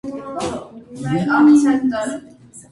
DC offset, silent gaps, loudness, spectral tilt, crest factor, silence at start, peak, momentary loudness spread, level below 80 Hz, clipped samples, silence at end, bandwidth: under 0.1%; none; -17 LUFS; -6 dB/octave; 14 dB; 0.05 s; -4 dBFS; 20 LU; -52 dBFS; under 0.1%; 0.1 s; 11.5 kHz